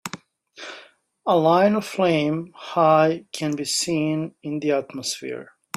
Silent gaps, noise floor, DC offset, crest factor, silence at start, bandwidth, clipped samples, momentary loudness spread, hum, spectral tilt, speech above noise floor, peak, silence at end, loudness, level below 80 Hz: none; -50 dBFS; under 0.1%; 18 dB; 0.05 s; 15 kHz; under 0.1%; 20 LU; none; -4.5 dB/octave; 29 dB; -4 dBFS; 0.35 s; -22 LUFS; -66 dBFS